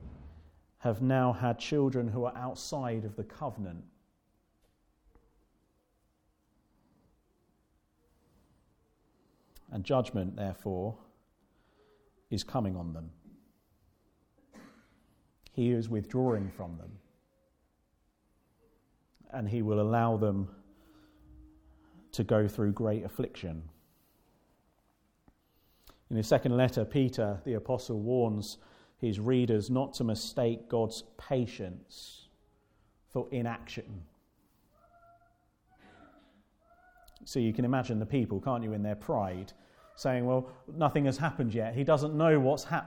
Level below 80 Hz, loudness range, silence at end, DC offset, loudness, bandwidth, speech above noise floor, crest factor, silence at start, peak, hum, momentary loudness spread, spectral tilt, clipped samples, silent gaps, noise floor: -60 dBFS; 11 LU; 0 s; under 0.1%; -32 LUFS; 17.5 kHz; 42 dB; 22 dB; 0 s; -12 dBFS; none; 15 LU; -7 dB/octave; under 0.1%; none; -74 dBFS